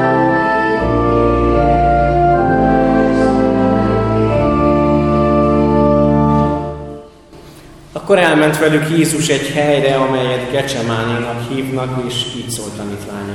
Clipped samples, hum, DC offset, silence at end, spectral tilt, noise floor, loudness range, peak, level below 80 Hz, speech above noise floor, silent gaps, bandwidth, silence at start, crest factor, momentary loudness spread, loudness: under 0.1%; none; under 0.1%; 0 s; -6 dB/octave; -38 dBFS; 4 LU; 0 dBFS; -28 dBFS; 23 dB; none; 17 kHz; 0 s; 14 dB; 9 LU; -14 LUFS